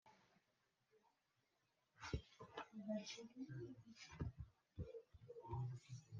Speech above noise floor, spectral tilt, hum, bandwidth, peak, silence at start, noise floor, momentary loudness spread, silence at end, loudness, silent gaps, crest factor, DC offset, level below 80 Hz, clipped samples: 34 dB; -6 dB/octave; none; 7.6 kHz; -32 dBFS; 0.05 s; -86 dBFS; 11 LU; 0 s; -54 LUFS; none; 22 dB; under 0.1%; -66 dBFS; under 0.1%